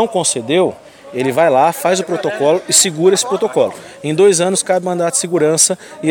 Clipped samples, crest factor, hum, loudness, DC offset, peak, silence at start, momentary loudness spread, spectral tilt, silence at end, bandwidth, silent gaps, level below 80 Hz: under 0.1%; 14 dB; none; -14 LUFS; under 0.1%; 0 dBFS; 0 s; 8 LU; -3 dB/octave; 0 s; 17.5 kHz; none; -64 dBFS